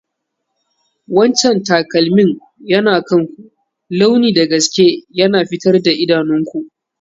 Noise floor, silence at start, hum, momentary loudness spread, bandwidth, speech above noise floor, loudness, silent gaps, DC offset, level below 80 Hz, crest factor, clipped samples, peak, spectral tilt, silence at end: -74 dBFS; 1.1 s; none; 9 LU; 7.8 kHz; 61 dB; -13 LUFS; none; under 0.1%; -58 dBFS; 14 dB; under 0.1%; 0 dBFS; -4.5 dB/octave; 0.35 s